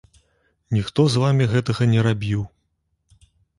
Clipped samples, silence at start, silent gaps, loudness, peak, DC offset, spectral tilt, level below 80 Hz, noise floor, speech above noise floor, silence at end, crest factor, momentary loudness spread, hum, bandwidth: under 0.1%; 0.7 s; none; -20 LUFS; -4 dBFS; under 0.1%; -7 dB/octave; -48 dBFS; -71 dBFS; 52 dB; 1.1 s; 18 dB; 8 LU; none; 11.5 kHz